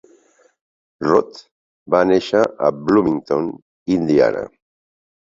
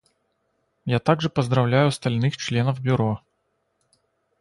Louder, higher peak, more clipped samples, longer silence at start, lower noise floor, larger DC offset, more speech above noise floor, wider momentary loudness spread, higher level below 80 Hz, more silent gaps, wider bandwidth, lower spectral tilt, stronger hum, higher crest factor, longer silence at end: first, -18 LUFS vs -22 LUFS; about the same, -2 dBFS vs -4 dBFS; neither; first, 1 s vs 0.85 s; second, -55 dBFS vs -72 dBFS; neither; second, 38 dB vs 51 dB; first, 13 LU vs 7 LU; about the same, -54 dBFS vs -56 dBFS; first, 1.51-1.86 s, 3.62-3.86 s vs none; second, 7.6 kHz vs 11.5 kHz; about the same, -7 dB/octave vs -6.5 dB/octave; neither; about the same, 18 dB vs 20 dB; second, 0.75 s vs 1.25 s